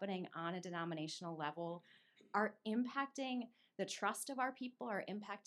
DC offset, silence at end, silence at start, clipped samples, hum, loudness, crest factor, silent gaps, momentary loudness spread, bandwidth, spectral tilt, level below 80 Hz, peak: under 0.1%; 0.05 s; 0 s; under 0.1%; none; -43 LUFS; 20 dB; none; 7 LU; 13 kHz; -4.5 dB/octave; under -90 dBFS; -22 dBFS